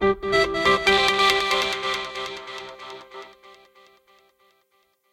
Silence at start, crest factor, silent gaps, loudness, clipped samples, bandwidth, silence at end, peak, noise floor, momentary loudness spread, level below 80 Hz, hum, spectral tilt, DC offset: 0 s; 24 dB; none; -20 LUFS; under 0.1%; 16 kHz; 1.6 s; 0 dBFS; -67 dBFS; 22 LU; -50 dBFS; none; -2.5 dB/octave; under 0.1%